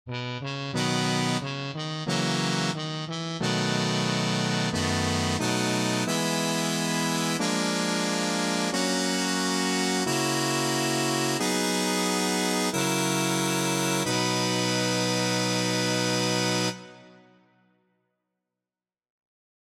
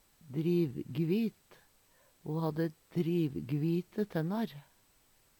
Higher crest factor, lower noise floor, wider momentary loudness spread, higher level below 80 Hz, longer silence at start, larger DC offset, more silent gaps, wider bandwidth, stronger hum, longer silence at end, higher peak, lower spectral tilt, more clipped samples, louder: about the same, 16 dB vs 16 dB; first, under -90 dBFS vs -68 dBFS; second, 4 LU vs 8 LU; first, -64 dBFS vs -72 dBFS; second, 0.05 s vs 0.25 s; neither; neither; second, 16.5 kHz vs 18.5 kHz; neither; first, 2.6 s vs 0.8 s; first, -12 dBFS vs -18 dBFS; second, -3.5 dB/octave vs -8.5 dB/octave; neither; first, -26 LUFS vs -34 LUFS